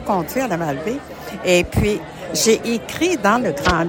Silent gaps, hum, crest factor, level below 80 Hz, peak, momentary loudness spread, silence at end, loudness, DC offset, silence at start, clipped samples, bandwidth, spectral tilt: none; none; 18 dB; -38 dBFS; 0 dBFS; 9 LU; 0 s; -19 LUFS; under 0.1%; 0 s; under 0.1%; 17 kHz; -4 dB/octave